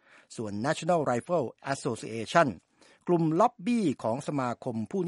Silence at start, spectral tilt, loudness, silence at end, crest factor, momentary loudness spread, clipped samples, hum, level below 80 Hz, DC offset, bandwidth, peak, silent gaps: 0.3 s; -6 dB/octave; -29 LUFS; 0 s; 22 dB; 11 LU; under 0.1%; none; -72 dBFS; under 0.1%; 11.5 kHz; -6 dBFS; none